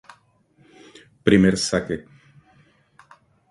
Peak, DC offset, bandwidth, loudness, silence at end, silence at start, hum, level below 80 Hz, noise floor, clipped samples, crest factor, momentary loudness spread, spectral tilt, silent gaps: -2 dBFS; under 0.1%; 11.5 kHz; -20 LUFS; 1.5 s; 1.25 s; none; -50 dBFS; -59 dBFS; under 0.1%; 24 dB; 15 LU; -5.5 dB/octave; none